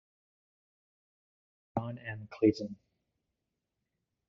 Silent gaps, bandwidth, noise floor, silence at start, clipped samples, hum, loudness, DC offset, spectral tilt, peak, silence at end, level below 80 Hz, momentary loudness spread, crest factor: none; 7 kHz; -86 dBFS; 1.75 s; under 0.1%; none; -34 LUFS; under 0.1%; -7 dB/octave; -14 dBFS; 1.55 s; -72 dBFS; 15 LU; 24 dB